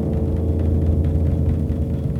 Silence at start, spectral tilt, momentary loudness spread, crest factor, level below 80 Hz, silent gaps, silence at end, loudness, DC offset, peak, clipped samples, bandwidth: 0 s; -11 dB/octave; 3 LU; 12 dB; -24 dBFS; none; 0 s; -21 LUFS; under 0.1%; -8 dBFS; under 0.1%; 3.6 kHz